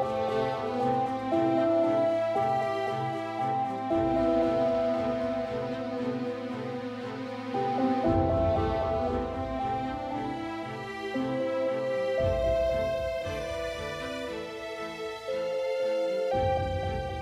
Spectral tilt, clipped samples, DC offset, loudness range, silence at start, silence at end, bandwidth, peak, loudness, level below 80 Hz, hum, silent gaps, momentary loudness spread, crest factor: -7 dB/octave; under 0.1%; under 0.1%; 4 LU; 0 s; 0 s; 13.5 kHz; -14 dBFS; -29 LUFS; -46 dBFS; none; none; 10 LU; 16 dB